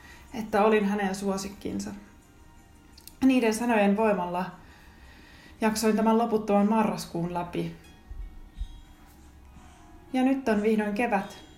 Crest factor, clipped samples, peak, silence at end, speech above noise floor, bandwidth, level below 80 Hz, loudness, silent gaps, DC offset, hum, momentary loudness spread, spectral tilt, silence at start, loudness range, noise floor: 18 dB; under 0.1%; -10 dBFS; 0.15 s; 27 dB; 16 kHz; -50 dBFS; -26 LUFS; none; under 0.1%; none; 21 LU; -5.5 dB/octave; 0.05 s; 7 LU; -53 dBFS